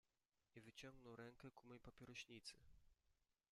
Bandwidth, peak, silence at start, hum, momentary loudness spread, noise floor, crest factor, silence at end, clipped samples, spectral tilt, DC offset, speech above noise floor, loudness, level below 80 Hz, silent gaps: 13 kHz; -44 dBFS; 0.55 s; none; 7 LU; under -90 dBFS; 20 dB; 0.25 s; under 0.1%; -4 dB/octave; under 0.1%; over 28 dB; -61 LUFS; -80 dBFS; none